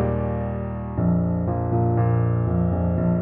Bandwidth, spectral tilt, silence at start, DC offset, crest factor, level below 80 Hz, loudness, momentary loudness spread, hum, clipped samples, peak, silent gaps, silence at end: 2.9 kHz; -14 dB/octave; 0 s; under 0.1%; 10 dB; -36 dBFS; -23 LUFS; 6 LU; none; under 0.1%; -10 dBFS; none; 0 s